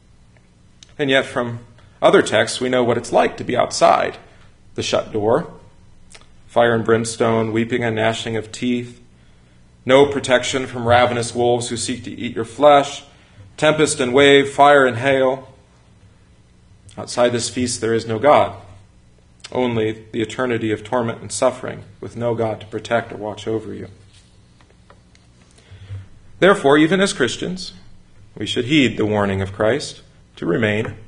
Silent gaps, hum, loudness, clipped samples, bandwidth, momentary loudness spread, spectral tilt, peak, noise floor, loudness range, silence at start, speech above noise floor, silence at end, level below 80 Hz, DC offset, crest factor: none; 60 Hz at -50 dBFS; -18 LUFS; under 0.1%; 11 kHz; 15 LU; -4.5 dB/octave; 0 dBFS; -50 dBFS; 7 LU; 1 s; 33 dB; 0 s; -48 dBFS; under 0.1%; 20 dB